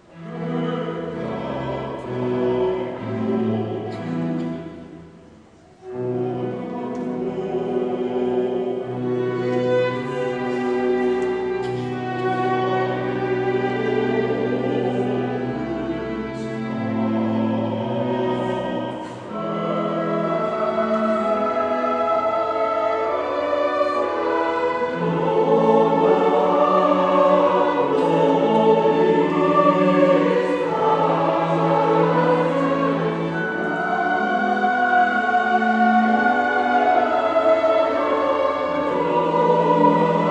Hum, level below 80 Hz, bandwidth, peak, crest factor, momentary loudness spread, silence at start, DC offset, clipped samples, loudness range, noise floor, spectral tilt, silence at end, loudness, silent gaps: none; -56 dBFS; 9.2 kHz; -4 dBFS; 16 dB; 10 LU; 0.15 s; under 0.1%; under 0.1%; 8 LU; -48 dBFS; -7.5 dB/octave; 0 s; -20 LUFS; none